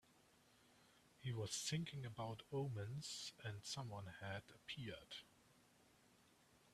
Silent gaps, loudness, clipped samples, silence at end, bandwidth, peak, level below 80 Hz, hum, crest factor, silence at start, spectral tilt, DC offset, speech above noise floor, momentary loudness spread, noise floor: none; -49 LUFS; under 0.1%; 0.05 s; 14 kHz; -32 dBFS; -78 dBFS; none; 18 dB; 0.1 s; -4 dB/octave; under 0.1%; 24 dB; 9 LU; -73 dBFS